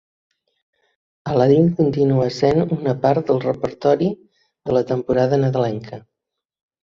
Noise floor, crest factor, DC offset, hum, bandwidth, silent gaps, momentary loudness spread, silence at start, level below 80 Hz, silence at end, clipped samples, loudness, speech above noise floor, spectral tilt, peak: -82 dBFS; 18 dB; under 0.1%; none; 7.4 kHz; none; 16 LU; 1.25 s; -52 dBFS; 0.85 s; under 0.1%; -18 LUFS; 65 dB; -8.5 dB/octave; -2 dBFS